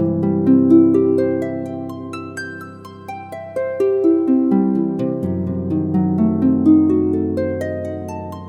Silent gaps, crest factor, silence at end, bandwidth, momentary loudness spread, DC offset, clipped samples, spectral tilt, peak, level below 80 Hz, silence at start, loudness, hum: none; 16 dB; 0 s; 8.4 kHz; 16 LU; under 0.1%; under 0.1%; -9.5 dB/octave; -2 dBFS; -54 dBFS; 0 s; -17 LUFS; none